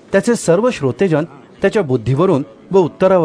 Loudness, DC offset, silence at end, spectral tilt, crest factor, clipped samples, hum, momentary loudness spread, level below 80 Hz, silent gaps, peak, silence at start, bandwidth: -15 LUFS; under 0.1%; 0 s; -6.5 dB/octave; 14 dB; under 0.1%; none; 6 LU; -48 dBFS; none; 0 dBFS; 0.1 s; 11 kHz